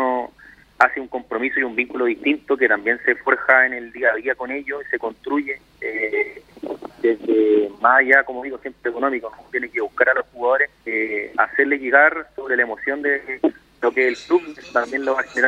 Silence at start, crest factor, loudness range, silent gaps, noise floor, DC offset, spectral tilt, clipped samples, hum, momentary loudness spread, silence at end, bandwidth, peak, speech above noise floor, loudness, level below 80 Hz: 0 s; 20 dB; 3 LU; none; -48 dBFS; under 0.1%; -4.5 dB/octave; under 0.1%; none; 12 LU; 0 s; 9 kHz; 0 dBFS; 28 dB; -20 LUFS; -60 dBFS